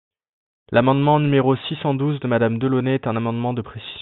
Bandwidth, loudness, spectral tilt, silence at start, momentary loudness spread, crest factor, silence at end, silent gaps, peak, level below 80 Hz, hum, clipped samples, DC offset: 4.2 kHz; -20 LUFS; -11 dB/octave; 0.7 s; 8 LU; 18 dB; 0 s; none; -2 dBFS; -56 dBFS; none; under 0.1%; under 0.1%